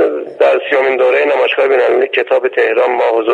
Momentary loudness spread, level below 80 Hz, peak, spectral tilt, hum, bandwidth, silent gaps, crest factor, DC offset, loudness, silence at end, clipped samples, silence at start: 2 LU; -64 dBFS; 0 dBFS; -4 dB/octave; none; 7.2 kHz; none; 12 dB; under 0.1%; -12 LUFS; 0 s; under 0.1%; 0 s